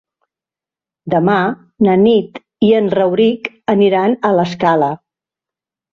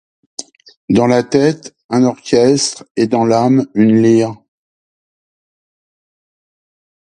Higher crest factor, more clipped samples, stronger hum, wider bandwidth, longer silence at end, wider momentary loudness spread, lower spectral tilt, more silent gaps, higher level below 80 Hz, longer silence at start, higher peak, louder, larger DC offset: about the same, 14 dB vs 16 dB; neither; neither; second, 7 kHz vs 11 kHz; second, 0.95 s vs 2.75 s; second, 8 LU vs 16 LU; first, -8 dB/octave vs -5.5 dB/octave; second, none vs 0.77-0.88 s, 1.84-1.89 s, 2.90-2.95 s; about the same, -56 dBFS vs -54 dBFS; first, 1.05 s vs 0.4 s; about the same, -2 dBFS vs 0 dBFS; about the same, -14 LUFS vs -13 LUFS; neither